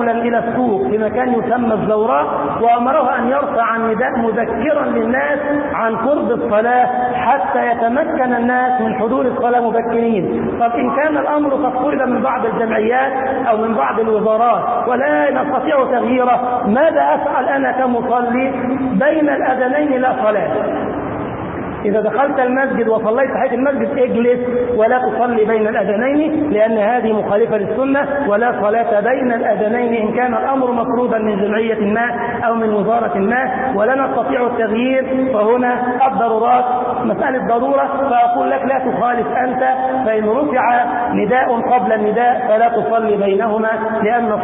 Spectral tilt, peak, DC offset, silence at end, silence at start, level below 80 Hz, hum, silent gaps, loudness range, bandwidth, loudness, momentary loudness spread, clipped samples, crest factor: -11.5 dB/octave; -4 dBFS; under 0.1%; 0 s; 0 s; -48 dBFS; none; none; 1 LU; 3.9 kHz; -15 LUFS; 3 LU; under 0.1%; 12 dB